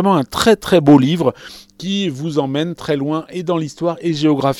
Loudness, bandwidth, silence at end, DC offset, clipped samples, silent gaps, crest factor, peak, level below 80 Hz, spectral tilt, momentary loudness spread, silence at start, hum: -16 LUFS; 17.5 kHz; 0 s; under 0.1%; under 0.1%; none; 16 dB; 0 dBFS; -48 dBFS; -6 dB/octave; 11 LU; 0 s; none